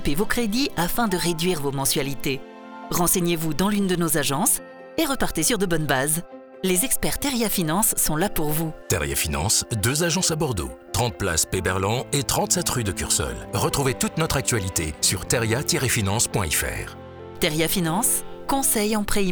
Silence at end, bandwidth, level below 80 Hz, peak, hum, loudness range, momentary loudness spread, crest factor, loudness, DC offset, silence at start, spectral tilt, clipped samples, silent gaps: 0 s; over 20 kHz; -38 dBFS; -6 dBFS; none; 1 LU; 7 LU; 18 dB; -22 LUFS; under 0.1%; 0 s; -3.5 dB/octave; under 0.1%; none